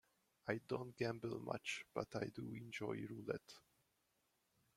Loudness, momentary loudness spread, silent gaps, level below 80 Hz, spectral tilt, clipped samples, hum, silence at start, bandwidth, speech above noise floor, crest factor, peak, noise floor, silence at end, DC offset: -47 LUFS; 6 LU; none; -78 dBFS; -5.5 dB/octave; under 0.1%; none; 0.45 s; 16 kHz; 37 dB; 24 dB; -24 dBFS; -84 dBFS; 1.2 s; under 0.1%